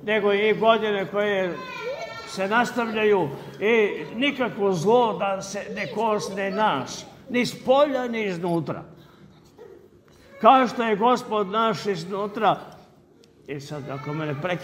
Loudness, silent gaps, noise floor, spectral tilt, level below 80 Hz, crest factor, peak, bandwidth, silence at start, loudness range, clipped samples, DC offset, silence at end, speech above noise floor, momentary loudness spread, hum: -23 LUFS; none; -54 dBFS; -5 dB/octave; -64 dBFS; 22 dB; -2 dBFS; 16 kHz; 0 s; 4 LU; under 0.1%; under 0.1%; 0 s; 31 dB; 12 LU; none